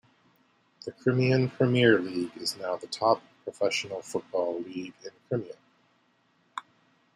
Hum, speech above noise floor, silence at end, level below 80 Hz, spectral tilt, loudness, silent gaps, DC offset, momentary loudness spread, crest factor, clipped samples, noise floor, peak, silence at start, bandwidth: none; 40 dB; 0.55 s; -72 dBFS; -5.5 dB/octave; -28 LUFS; none; under 0.1%; 20 LU; 24 dB; under 0.1%; -68 dBFS; -6 dBFS; 0.85 s; 13 kHz